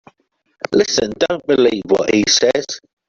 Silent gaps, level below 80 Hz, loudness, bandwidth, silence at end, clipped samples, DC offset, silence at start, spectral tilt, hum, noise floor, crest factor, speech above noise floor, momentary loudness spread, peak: none; -52 dBFS; -15 LUFS; 7.6 kHz; 0.3 s; under 0.1%; under 0.1%; 0.7 s; -3 dB/octave; none; -65 dBFS; 16 dB; 50 dB; 8 LU; -2 dBFS